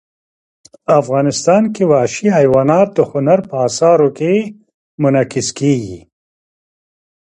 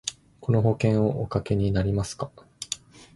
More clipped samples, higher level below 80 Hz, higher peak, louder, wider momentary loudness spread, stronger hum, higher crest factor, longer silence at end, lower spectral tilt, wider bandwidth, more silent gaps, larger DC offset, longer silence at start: neither; second, -54 dBFS vs -44 dBFS; first, 0 dBFS vs -8 dBFS; first, -13 LUFS vs -26 LUFS; second, 7 LU vs 13 LU; neither; about the same, 14 dB vs 18 dB; first, 1.3 s vs 0.4 s; about the same, -6 dB/octave vs -6.5 dB/octave; about the same, 11 kHz vs 11.5 kHz; first, 4.74-4.98 s vs none; neither; first, 0.9 s vs 0.05 s